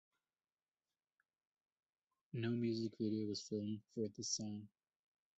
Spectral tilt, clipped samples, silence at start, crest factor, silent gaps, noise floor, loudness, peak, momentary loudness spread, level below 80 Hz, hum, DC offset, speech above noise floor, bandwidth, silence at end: -6.5 dB/octave; under 0.1%; 2.35 s; 18 dB; none; under -90 dBFS; -43 LUFS; -28 dBFS; 10 LU; -80 dBFS; none; under 0.1%; over 48 dB; 8 kHz; 0.7 s